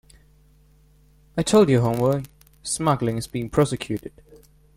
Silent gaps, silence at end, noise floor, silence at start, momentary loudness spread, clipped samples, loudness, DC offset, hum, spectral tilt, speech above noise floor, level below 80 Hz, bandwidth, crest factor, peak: none; 0.4 s; -55 dBFS; 1.35 s; 15 LU; under 0.1%; -22 LUFS; under 0.1%; none; -6 dB/octave; 34 dB; -50 dBFS; 16.5 kHz; 20 dB; -4 dBFS